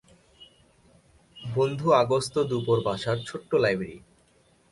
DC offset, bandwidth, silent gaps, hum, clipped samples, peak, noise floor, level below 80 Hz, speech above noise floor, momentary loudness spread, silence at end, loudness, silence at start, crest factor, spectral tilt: under 0.1%; 11.5 kHz; none; none; under 0.1%; -8 dBFS; -62 dBFS; -60 dBFS; 37 dB; 10 LU; 0.75 s; -26 LUFS; 0.4 s; 20 dB; -6 dB/octave